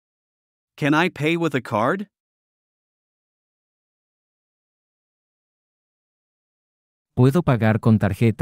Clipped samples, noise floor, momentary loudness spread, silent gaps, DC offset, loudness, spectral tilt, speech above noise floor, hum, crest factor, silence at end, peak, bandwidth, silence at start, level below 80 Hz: under 0.1%; under -90 dBFS; 9 LU; 2.20-7.05 s; under 0.1%; -20 LUFS; -7.5 dB/octave; over 71 dB; none; 20 dB; 0.05 s; -4 dBFS; 16 kHz; 0.8 s; -54 dBFS